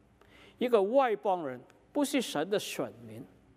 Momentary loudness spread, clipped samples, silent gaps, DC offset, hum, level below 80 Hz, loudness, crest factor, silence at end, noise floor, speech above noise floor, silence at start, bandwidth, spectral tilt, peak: 21 LU; under 0.1%; none; under 0.1%; none; -74 dBFS; -31 LUFS; 20 dB; 0.3 s; -59 dBFS; 28 dB; 0.6 s; 16 kHz; -4 dB/octave; -12 dBFS